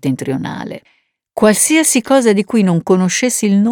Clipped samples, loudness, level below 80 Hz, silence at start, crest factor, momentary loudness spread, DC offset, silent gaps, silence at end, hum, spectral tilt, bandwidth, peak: under 0.1%; -13 LUFS; -56 dBFS; 0.05 s; 12 dB; 16 LU; under 0.1%; none; 0 s; none; -4.5 dB/octave; 18.5 kHz; 0 dBFS